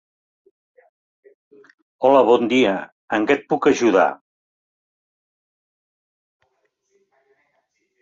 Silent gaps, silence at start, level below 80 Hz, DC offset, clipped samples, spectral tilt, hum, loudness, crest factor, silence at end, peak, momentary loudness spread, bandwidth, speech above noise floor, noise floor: 2.92-3.08 s; 2 s; -66 dBFS; under 0.1%; under 0.1%; -5 dB/octave; none; -18 LUFS; 20 dB; 3.85 s; -2 dBFS; 10 LU; 7.8 kHz; 53 dB; -70 dBFS